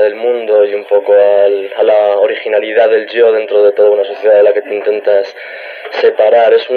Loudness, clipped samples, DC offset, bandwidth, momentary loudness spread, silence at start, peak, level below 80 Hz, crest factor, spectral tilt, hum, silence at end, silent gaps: -10 LUFS; under 0.1%; under 0.1%; 5 kHz; 7 LU; 0 s; 0 dBFS; -72 dBFS; 10 dB; -4.5 dB/octave; none; 0 s; none